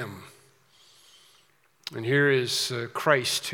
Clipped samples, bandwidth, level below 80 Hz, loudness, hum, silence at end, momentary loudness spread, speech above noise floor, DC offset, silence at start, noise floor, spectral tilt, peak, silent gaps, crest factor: under 0.1%; 18 kHz; -80 dBFS; -24 LUFS; none; 0 s; 17 LU; 38 dB; under 0.1%; 0 s; -64 dBFS; -3.5 dB/octave; -6 dBFS; none; 24 dB